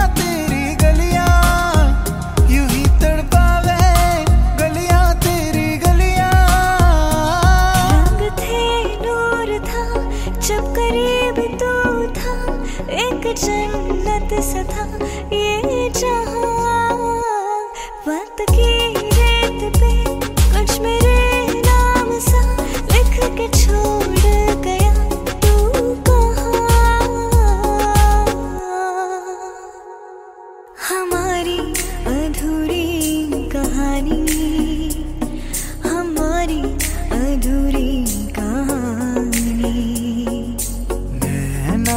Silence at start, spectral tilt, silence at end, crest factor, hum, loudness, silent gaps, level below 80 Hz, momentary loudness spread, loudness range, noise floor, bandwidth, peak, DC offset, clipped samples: 0 s; -5 dB/octave; 0 s; 16 dB; none; -17 LUFS; none; -18 dBFS; 9 LU; 6 LU; -38 dBFS; 16.5 kHz; 0 dBFS; under 0.1%; under 0.1%